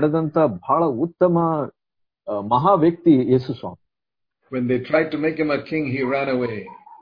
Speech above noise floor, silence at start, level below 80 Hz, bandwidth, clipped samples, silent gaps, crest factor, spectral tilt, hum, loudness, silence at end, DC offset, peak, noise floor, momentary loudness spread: 66 dB; 0 s; -58 dBFS; 5.2 kHz; under 0.1%; none; 18 dB; -10 dB/octave; none; -20 LUFS; 0.05 s; under 0.1%; -4 dBFS; -86 dBFS; 14 LU